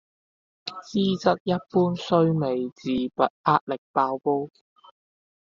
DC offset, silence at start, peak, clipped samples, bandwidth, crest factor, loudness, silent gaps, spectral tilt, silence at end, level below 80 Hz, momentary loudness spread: under 0.1%; 0.65 s; -4 dBFS; under 0.1%; 7.4 kHz; 20 dB; -24 LUFS; 1.40-1.46 s, 3.30-3.44 s, 3.61-3.67 s, 3.78-3.94 s; -5.5 dB/octave; 1.05 s; -64 dBFS; 8 LU